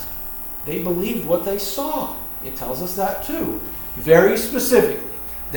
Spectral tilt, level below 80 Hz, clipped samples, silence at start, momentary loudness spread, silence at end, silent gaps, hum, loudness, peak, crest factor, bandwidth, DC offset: -4.5 dB/octave; -42 dBFS; under 0.1%; 0 s; 12 LU; 0 s; none; none; -20 LUFS; 0 dBFS; 20 dB; over 20 kHz; under 0.1%